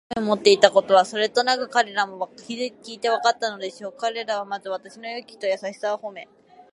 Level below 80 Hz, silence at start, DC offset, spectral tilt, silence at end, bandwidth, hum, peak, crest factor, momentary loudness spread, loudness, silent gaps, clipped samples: -68 dBFS; 0.1 s; under 0.1%; -3 dB/octave; 0.5 s; 11.5 kHz; none; 0 dBFS; 24 dB; 17 LU; -22 LUFS; none; under 0.1%